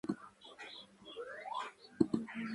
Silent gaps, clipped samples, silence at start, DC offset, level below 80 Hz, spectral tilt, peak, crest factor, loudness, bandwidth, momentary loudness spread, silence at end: none; under 0.1%; 0.05 s; under 0.1%; -70 dBFS; -6 dB/octave; -14 dBFS; 28 dB; -41 LUFS; 11.5 kHz; 16 LU; 0 s